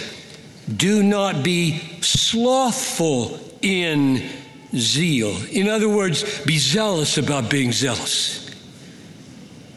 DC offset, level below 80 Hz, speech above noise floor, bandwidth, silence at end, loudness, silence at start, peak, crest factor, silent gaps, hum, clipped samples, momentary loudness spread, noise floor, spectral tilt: under 0.1%; -54 dBFS; 21 dB; 12.5 kHz; 0 s; -19 LUFS; 0 s; -2 dBFS; 18 dB; none; none; under 0.1%; 14 LU; -41 dBFS; -4 dB/octave